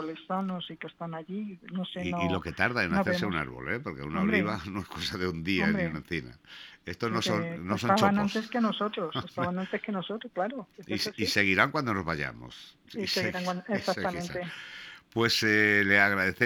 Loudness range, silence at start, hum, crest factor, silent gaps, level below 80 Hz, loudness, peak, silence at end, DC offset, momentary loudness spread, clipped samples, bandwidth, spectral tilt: 3 LU; 0 s; none; 24 dB; none; -58 dBFS; -29 LUFS; -6 dBFS; 0 s; under 0.1%; 16 LU; under 0.1%; 18.5 kHz; -5 dB/octave